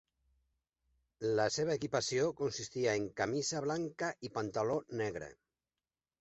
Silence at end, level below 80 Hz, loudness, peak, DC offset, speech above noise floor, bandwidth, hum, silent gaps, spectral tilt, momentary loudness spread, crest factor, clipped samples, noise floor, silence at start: 0.9 s; -70 dBFS; -36 LUFS; -18 dBFS; under 0.1%; over 54 dB; 8 kHz; none; none; -4 dB/octave; 7 LU; 20 dB; under 0.1%; under -90 dBFS; 1.2 s